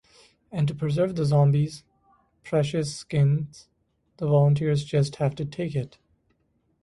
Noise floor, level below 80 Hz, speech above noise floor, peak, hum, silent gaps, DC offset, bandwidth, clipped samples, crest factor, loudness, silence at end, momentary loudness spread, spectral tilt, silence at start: -70 dBFS; -58 dBFS; 46 dB; -10 dBFS; none; none; under 0.1%; 11.5 kHz; under 0.1%; 16 dB; -25 LUFS; 0.95 s; 12 LU; -7.5 dB/octave; 0.5 s